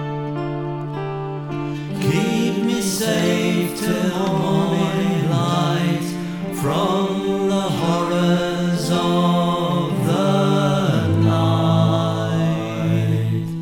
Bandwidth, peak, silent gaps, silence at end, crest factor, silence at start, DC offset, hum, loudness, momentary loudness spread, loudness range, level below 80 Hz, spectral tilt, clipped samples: 19 kHz; -6 dBFS; none; 0 s; 14 dB; 0 s; under 0.1%; none; -20 LUFS; 9 LU; 3 LU; -52 dBFS; -6 dB/octave; under 0.1%